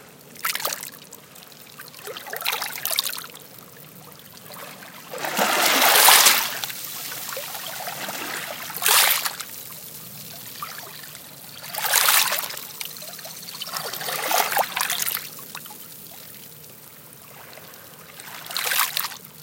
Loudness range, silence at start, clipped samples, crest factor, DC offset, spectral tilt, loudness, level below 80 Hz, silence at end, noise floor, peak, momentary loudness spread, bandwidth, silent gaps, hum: 11 LU; 0 s; under 0.1%; 26 dB; under 0.1%; 0.5 dB/octave; -20 LUFS; -74 dBFS; 0 s; -45 dBFS; 0 dBFS; 26 LU; 17.5 kHz; none; none